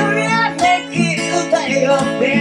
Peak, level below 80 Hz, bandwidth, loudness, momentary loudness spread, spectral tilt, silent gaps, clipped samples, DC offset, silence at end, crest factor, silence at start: -2 dBFS; -52 dBFS; 11.5 kHz; -15 LUFS; 2 LU; -4.5 dB/octave; none; under 0.1%; under 0.1%; 0 s; 12 dB; 0 s